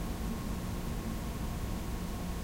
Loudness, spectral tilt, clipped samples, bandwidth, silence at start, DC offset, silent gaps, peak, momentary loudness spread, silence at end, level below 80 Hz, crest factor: -38 LUFS; -5.5 dB/octave; under 0.1%; 16 kHz; 0 s; under 0.1%; none; -24 dBFS; 1 LU; 0 s; -40 dBFS; 12 dB